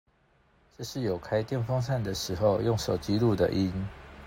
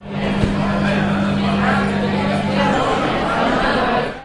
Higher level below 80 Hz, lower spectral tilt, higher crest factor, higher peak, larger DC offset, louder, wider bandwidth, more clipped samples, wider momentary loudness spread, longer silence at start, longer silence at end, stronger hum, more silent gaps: second, -50 dBFS vs -36 dBFS; about the same, -6.5 dB/octave vs -6.5 dB/octave; about the same, 16 dB vs 16 dB; second, -12 dBFS vs -2 dBFS; second, under 0.1% vs 0.2%; second, -29 LUFS vs -18 LUFS; first, 16 kHz vs 11 kHz; neither; first, 10 LU vs 2 LU; first, 0.8 s vs 0 s; about the same, 0 s vs 0 s; neither; neither